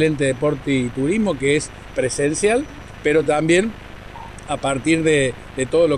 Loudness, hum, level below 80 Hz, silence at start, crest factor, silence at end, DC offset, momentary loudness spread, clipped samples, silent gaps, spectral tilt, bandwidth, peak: -19 LUFS; 50 Hz at -45 dBFS; -42 dBFS; 0 s; 16 dB; 0 s; under 0.1%; 14 LU; under 0.1%; none; -5 dB/octave; 11.5 kHz; -4 dBFS